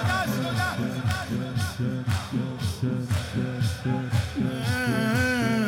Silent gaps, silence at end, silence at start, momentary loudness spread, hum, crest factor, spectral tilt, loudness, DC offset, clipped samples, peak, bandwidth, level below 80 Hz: none; 0 s; 0 s; 6 LU; none; 14 dB; -5.5 dB/octave; -27 LUFS; under 0.1%; under 0.1%; -12 dBFS; 16.5 kHz; -46 dBFS